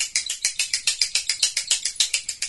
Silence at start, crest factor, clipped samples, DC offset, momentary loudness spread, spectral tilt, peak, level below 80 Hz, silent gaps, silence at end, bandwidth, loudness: 0 s; 24 dB; under 0.1%; under 0.1%; 3 LU; 5 dB/octave; 0 dBFS; -60 dBFS; none; 0 s; 12 kHz; -21 LUFS